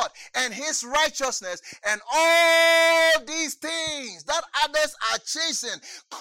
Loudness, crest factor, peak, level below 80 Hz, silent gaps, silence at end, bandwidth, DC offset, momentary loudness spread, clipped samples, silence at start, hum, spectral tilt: -22 LUFS; 16 dB; -8 dBFS; -60 dBFS; none; 0 s; 17 kHz; under 0.1%; 14 LU; under 0.1%; 0 s; none; 0.5 dB/octave